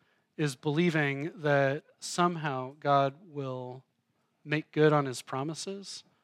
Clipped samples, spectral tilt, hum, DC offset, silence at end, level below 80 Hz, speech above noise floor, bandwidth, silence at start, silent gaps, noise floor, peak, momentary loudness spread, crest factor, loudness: under 0.1%; -5.5 dB/octave; none; under 0.1%; 0.25 s; -86 dBFS; 46 dB; 13.5 kHz; 0.4 s; none; -76 dBFS; -12 dBFS; 14 LU; 20 dB; -30 LUFS